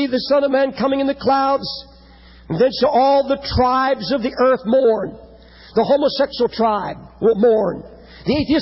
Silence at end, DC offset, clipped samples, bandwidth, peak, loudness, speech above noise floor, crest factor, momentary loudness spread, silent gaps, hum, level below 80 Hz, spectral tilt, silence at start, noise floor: 0 s; under 0.1%; under 0.1%; 5.8 kHz; -6 dBFS; -17 LUFS; 27 dB; 12 dB; 9 LU; none; none; -40 dBFS; -9.5 dB/octave; 0 s; -44 dBFS